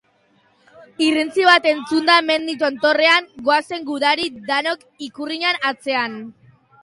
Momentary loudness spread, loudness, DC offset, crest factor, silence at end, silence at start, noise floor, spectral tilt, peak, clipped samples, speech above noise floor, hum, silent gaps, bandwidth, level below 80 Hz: 13 LU; -18 LUFS; under 0.1%; 18 dB; 0.5 s; 0.8 s; -59 dBFS; -2.5 dB/octave; 0 dBFS; under 0.1%; 41 dB; none; none; 11.5 kHz; -66 dBFS